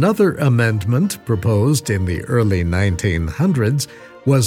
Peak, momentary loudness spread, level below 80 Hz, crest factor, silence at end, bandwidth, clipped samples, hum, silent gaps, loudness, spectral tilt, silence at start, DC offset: -4 dBFS; 5 LU; -36 dBFS; 14 dB; 0 s; 16.5 kHz; under 0.1%; none; none; -18 LUFS; -6.5 dB/octave; 0 s; under 0.1%